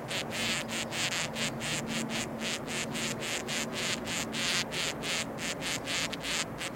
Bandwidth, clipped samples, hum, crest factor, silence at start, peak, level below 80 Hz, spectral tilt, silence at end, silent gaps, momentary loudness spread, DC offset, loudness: 17 kHz; under 0.1%; none; 22 dB; 0 s; -12 dBFS; -58 dBFS; -2 dB/octave; 0 s; none; 4 LU; under 0.1%; -32 LUFS